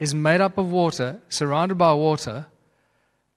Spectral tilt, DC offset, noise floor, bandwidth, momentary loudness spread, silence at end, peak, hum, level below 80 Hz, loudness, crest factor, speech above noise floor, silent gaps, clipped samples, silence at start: -5.5 dB/octave; under 0.1%; -68 dBFS; 14 kHz; 10 LU; 0.9 s; -4 dBFS; none; -60 dBFS; -21 LUFS; 20 dB; 47 dB; none; under 0.1%; 0 s